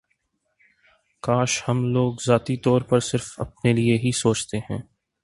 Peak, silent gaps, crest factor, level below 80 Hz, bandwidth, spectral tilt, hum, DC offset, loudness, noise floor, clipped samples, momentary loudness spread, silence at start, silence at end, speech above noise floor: -4 dBFS; none; 20 dB; -52 dBFS; 11.5 kHz; -5.5 dB/octave; none; under 0.1%; -22 LUFS; -72 dBFS; under 0.1%; 10 LU; 1.25 s; 0.4 s; 50 dB